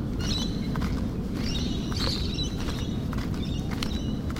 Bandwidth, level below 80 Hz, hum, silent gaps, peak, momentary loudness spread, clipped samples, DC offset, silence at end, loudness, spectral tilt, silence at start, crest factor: 16 kHz; -34 dBFS; none; none; -10 dBFS; 3 LU; under 0.1%; under 0.1%; 0 s; -29 LUFS; -5.5 dB/octave; 0 s; 18 dB